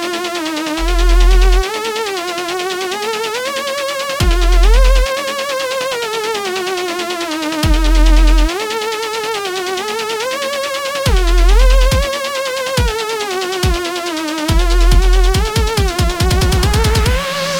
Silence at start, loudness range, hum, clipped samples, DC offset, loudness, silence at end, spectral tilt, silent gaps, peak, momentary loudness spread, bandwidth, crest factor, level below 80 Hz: 0 s; 2 LU; none; under 0.1%; under 0.1%; -16 LUFS; 0 s; -4.5 dB/octave; none; 0 dBFS; 6 LU; 17.5 kHz; 14 dB; -14 dBFS